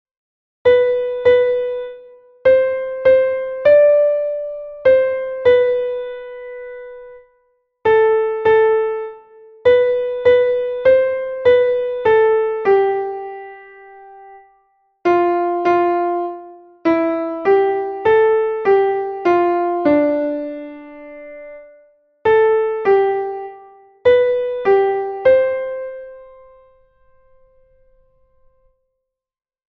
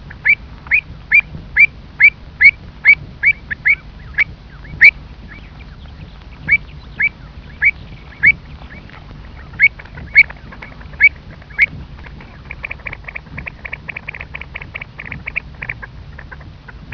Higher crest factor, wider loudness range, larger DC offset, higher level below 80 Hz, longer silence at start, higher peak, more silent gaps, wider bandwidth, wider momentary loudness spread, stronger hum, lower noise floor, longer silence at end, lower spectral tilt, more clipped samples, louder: about the same, 14 dB vs 18 dB; second, 5 LU vs 16 LU; second, under 0.1% vs 0.1%; second, -54 dBFS vs -38 dBFS; first, 0.65 s vs 0.05 s; about the same, -2 dBFS vs 0 dBFS; neither; about the same, 5 kHz vs 5.4 kHz; second, 18 LU vs 25 LU; neither; first, -78 dBFS vs -35 dBFS; first, 3.45 s vs 0 s; first, -7 dB/octave vs -5 dB/octave; second, under 0.1% vs 0.1%; second, -16 LUFS vs -12 LUFS